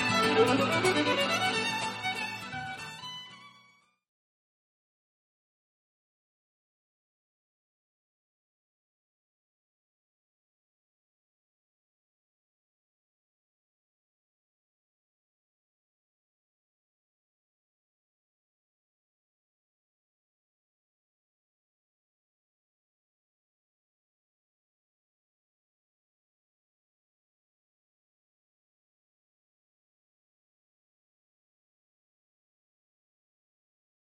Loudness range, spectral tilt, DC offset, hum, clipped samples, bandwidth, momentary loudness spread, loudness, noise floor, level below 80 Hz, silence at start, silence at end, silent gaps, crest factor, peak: 20 LU; -3.5 dB/octave; under 0.1%; none; under 0.1%; 12.5 kHz; 16 LU; -28 LUFS; -64 dBFS; -74 dBFS; 0 s; 30.55 s; none; 26 dB; -12 dBFS